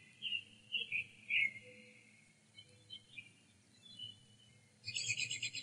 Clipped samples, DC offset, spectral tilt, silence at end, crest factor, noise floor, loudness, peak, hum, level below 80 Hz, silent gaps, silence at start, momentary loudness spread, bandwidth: under 0.1%; under 0.1%; 0.5 dB/octave; 0 s; 22 dB; -68 dBFS; -40 LUFS; -22 dBFS; none; -86 dBFS; none; 0 s; 25 LU; 11.5 kHz